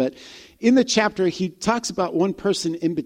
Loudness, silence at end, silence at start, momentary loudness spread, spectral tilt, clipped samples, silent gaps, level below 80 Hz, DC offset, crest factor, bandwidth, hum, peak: -21 LUFS; 0 s; 0 s; 7 LU; -4.5 dB/octave; under 0.1%; none; -56 dBFS; under 0.1%; 16 dB; 14 kHz; none; -4 dBFS